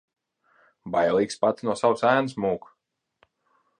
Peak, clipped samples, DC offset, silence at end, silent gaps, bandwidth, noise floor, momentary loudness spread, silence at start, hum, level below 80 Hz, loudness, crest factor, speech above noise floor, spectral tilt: -6 dBFS; under 0.1%; under 0.1%; 1.2 s; none; 10.5 kHz; -76 dBFS; 7 LU; 0.85 s; none; -64 dBFS; -24 LUFS; 20 dB; 53 dB; -5.5 dB/octave